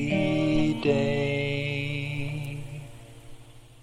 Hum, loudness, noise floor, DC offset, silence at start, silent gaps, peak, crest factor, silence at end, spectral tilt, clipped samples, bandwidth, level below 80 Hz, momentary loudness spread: none; -27 LUFS; -47 dBFS; under 0.1%; 0 s; none; -10 dBFS; 16 dB; 0.05 s; -7 dB/octave; under 0.1%; 13 kHz; -46 dBFS; 17 LU